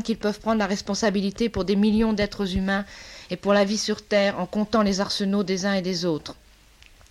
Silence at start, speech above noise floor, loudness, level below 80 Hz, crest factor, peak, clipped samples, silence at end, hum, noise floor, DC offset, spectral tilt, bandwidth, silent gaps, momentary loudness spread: 0 s; 29 dB; -24 LUFS; -46 dBFS; 16 dB; -8 dBFS; under 0.1%; 0.75 s; none; -52 dBFS; under 0.1%; -5 dB/octave; 12.5 kHz; none; 7 LU